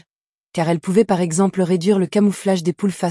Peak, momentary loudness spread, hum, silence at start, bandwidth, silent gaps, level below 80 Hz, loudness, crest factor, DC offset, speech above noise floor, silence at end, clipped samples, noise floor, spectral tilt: -4 dBFS; 5 LU; none; 0.55 s; 12 kHz; none; -62 dBFS; -18 LUFS; 14 dB; under 0.1%; 71 dB; 0 s; under 0.1%; -89 dBFS; -6.5 dB/octave